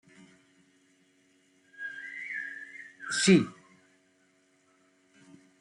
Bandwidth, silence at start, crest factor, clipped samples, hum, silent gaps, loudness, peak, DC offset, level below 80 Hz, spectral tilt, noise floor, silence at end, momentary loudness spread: 11 kHz; 1.8 s; 24 dB; under 0.1%; none; none; -29 LUFS; -10 dBFS; under 0.1%; -76 dBFS; -4.5 dB/octave; -68 dBFS; 2.1 s; 20 LU